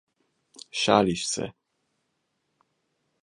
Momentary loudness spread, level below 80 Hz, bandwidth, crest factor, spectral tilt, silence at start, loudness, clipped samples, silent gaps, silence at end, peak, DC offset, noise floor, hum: 14 LU; -60 dBFS; 11.5 kHz; 28 dB; -3.5 dB/octave; 0.75 s; -25 LUFS; under 0.1%; none; 1.75 s; -2 dBFS; under 0.1%; -77 dBFS; none